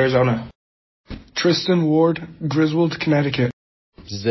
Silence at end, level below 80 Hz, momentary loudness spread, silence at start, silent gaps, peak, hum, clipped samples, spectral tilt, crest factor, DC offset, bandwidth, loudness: 0 s; -48 dBFS; 15 LU; 0 s; 0.55-1.04 s, 3.53-3.92 s; -4 dBFS; none; under 0.1%; -6.5 dB/octave; 16 dB; under 0.1%; 6.2 kHz; -20 LUFS